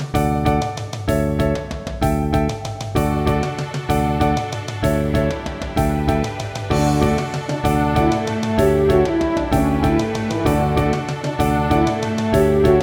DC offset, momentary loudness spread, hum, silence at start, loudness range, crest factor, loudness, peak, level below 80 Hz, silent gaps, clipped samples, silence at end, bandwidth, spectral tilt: under 0.1%; 8 LU; none; 0 s; 3 LU; 16 dB; -19 LUFS; -2 dBFS; -28 dBFS; none; under 0.1%; 0 s; over 20 kHz; -6.5 dB/octave